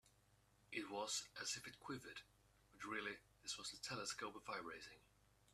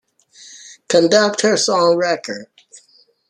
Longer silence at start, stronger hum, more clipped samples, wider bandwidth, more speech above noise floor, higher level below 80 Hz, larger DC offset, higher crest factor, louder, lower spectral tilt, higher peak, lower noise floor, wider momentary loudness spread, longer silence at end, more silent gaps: second, 0.05 s vs 0.5 s; neither; neither; first, 14 kHz vs 11.5 kHz; second, 25 dB vs 39 dB; second, -80 dBFS vs -66 dBFS; neither; first, 22 dB vs 16 dB; second, -49 LUFS vs -15 LUFS; second, -1.5 dB/octave vs -3 dB/octave; second, -30 dBFS vs -2 dBFS; first, -76 dBFS vs -54 dBFS; second, 12 LU vs 19 LU; second, 0.05 s vs 0.5 s; neither